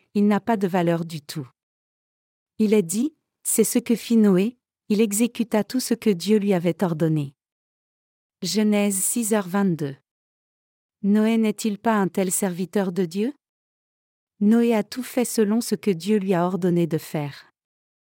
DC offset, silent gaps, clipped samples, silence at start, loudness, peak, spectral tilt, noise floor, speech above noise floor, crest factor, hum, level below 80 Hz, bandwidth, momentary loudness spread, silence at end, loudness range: under 0.1%; 1.63-2.46 s, 7.52-8.30 s, 10.11-10.89 s, 13.49-14.27 s; under 0.1%; 0.15 s; -22 LUFS; -6 dBFS; -5.5 dB/octave; under -90 dBFS; over 69 dB; 16 dB; none; -74 dBFS; 17 kHz; 10 LU; 0.65 s; 3 LU